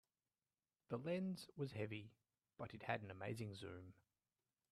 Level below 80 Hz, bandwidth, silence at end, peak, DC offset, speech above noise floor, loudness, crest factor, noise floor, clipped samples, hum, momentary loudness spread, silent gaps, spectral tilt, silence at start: -82 dBFS; 13 kHz; 0.8 s; -26 dBFS; under 0.1%; over 41 dB; -49 LUFS; 24 dB; under -90 dBFS; under 0.1%; none; 11 LU; none; -6.5 dB/octave; 0.9 s